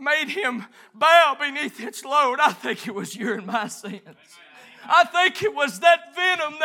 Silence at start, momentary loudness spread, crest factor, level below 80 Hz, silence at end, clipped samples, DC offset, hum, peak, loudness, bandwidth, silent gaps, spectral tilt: 0 s; 16 LU; 20 dB; -82 dBFS; 0 s; under 0.1%; under 0.1%; none; -2 dBFS; -20 LUFS; 16.5 kHz; none; -2.5 dB/octave